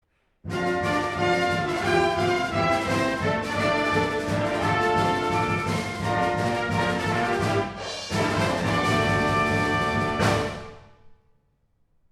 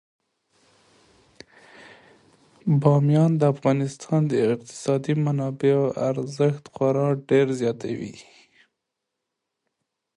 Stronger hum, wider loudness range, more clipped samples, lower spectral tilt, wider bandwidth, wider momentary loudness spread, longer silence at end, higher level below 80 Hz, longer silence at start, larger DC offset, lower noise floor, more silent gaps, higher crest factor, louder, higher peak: neither; second, 2 LU vs 5 LU; neither; second, -5.5 dB/octave vs -8 dB/octave; first, 14.5 kHz vs 11 kHz; second, 5 LU vs 8 LU; second, 0.95 s vs 1.95 s; first, -46 dBFS vs -66 dBFS; second, 0.45 s vs 2.65 s; neither; second, -67 dBFS vs -82 dBFS; neither; about the same, 16 dB vs 18 dB; about the same, -24 LUFS vs -23 LUFS; about the same, -8 dBFS vs -6 dBFS